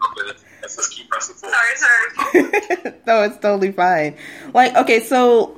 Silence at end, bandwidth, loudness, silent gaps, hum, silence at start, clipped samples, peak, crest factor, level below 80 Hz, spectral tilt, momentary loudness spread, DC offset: 0.05 s; 16 kHz; -16 LUFS; none; none; 0 s; under 0.1%; 0 dBFS; 16 dB; -64 dBFS; -3 dB/octave; 12 LU; under 0.1%